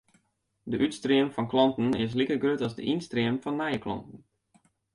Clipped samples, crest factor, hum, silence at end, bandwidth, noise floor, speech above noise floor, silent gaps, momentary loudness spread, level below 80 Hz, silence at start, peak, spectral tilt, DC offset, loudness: under 0.1%; 18 dB; none; 0.8 s; 11 kHz; -74 dBFS; 46 dB; none; 9 LU; -60 dBFS; 0.65 s; -10 dBFS; -6.5 dB/octave; under 0.1%; -28 LUFS